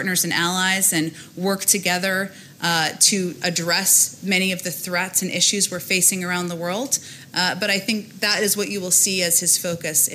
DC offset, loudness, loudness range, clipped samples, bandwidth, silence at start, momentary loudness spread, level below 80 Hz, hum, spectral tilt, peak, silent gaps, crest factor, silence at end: under 0.1%; -19 LUFS; 2 LU; under 0.1%; 16.5 kHz; 0 s; 9 LU; -70 dBFS; none; -1.5 dB/octave; -4 dBFS; none; 18 dB; 0 s